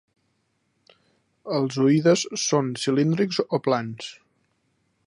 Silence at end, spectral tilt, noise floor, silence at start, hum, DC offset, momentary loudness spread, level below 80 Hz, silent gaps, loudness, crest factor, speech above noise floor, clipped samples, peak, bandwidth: 0.95 s; -5 dB/octave; -71 dBFS; 1.45 s; none; under 0.1%; 15 LU; -72 dBFS; none; -23 LUFS; 18 dB; 49 dB; under 0.1%; -8 dBFS; 11 kHz